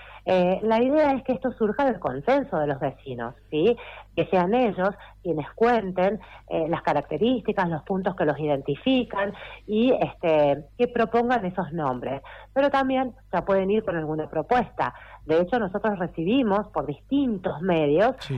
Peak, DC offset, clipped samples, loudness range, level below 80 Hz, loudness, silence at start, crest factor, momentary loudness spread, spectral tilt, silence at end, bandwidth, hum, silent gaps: -12 dBFS; under 0.1%; under 0.1%; 2 LU; -52 dBFS; -25 LUFS; 0 s; 12 dB; 8 LU; -8 dB/octave; 0 s; 8.2 kHz; none; none